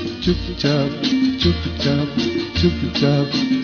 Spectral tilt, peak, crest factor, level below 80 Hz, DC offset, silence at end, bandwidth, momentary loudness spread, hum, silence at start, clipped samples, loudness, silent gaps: -6.5 dB/octave; -4 dBFS; 16 dB; -34 dBFS; under 0.1%; 0 s; 6.8 kHz; 4 LU; none; 0 s; under 0.1%; -19 LUFS; none